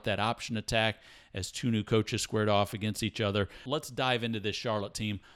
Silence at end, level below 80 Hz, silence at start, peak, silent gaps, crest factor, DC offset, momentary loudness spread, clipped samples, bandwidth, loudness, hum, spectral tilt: 0.15 s; -56 dBFS; 0.05 s; -12 dBFS; none; 18 dB; under 0.1%; 7 LU; under 0.1%; 15.5 kHz; -31 LUFS; none; -4.5 dB/octave